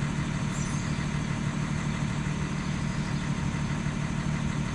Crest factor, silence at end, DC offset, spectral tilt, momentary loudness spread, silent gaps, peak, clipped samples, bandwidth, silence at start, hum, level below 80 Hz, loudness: 12 dB; 0 s; under 0.1%; -5.5 dB/octave; 1 LU; none; -16 dBFS; under 0.1%; 11.5 kHz; 0 s; none; -42 dBFS; -30 LUFS